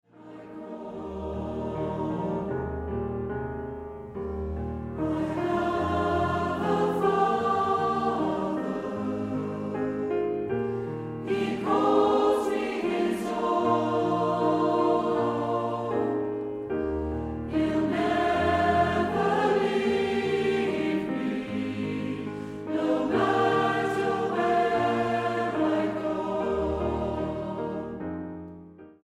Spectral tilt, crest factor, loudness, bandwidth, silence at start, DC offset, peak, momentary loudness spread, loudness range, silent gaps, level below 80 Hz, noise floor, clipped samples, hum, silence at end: -7 dB/octave; 18 dB; -27 LUFS; 13 kHz; 0.15 s; under 0.1%; -10 dBFS; 11 LU; 7 LU; none; -48 dBFS; -47 dBFS; under 0.1%; none; 0.1 s